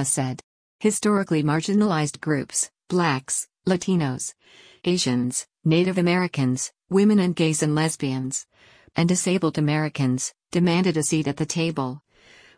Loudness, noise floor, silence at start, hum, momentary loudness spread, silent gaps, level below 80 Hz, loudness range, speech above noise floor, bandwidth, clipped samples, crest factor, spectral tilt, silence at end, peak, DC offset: -23 LUFS; -53 dBFS; 0 s; none; 8 LU; 0.43-0.79 s; -60 dBFS; 2 LU; 31 dB; 10.5 kHz; under 0.1%; 14 dB; -5 dB/octave; 0.6 s; -8 dBFS; under 0.1%